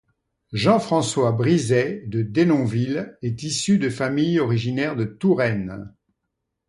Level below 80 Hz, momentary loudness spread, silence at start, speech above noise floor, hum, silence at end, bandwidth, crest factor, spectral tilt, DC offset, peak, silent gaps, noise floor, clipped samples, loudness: -54 dBFS; 9 LU; 0.5 s; 58 dB; none; 0.8 s; 11.5 kHz; 18 dB; -6 dB/octave; under 0.1%; -4 dBFS; none; -79 dBFS; under 0.1%; -21 LUFS